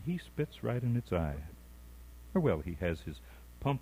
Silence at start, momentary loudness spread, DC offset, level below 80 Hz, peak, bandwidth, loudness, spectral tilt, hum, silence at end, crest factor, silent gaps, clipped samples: 0 s; 22 LU; under 0.1%; -50 dBFS; -18 dBFS; 16 kHz; -35 LUFS; -8 dB/octave; none; 0 s; 18 dB; none; under 0.1%